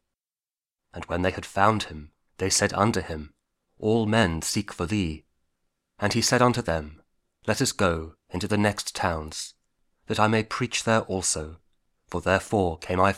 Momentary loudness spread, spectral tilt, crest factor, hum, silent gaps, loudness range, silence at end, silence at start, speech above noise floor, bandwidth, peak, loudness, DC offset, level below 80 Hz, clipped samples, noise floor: 13 LU; -4 dB/octave; 22 dB; none; none; 2 LU; 0 s; 0.95 s; over 65 dB; 16 kHz; -4 dBFS; -25 LUFS; under 0.1%; -48 dBFS; under 0.1%; under -90 dBFS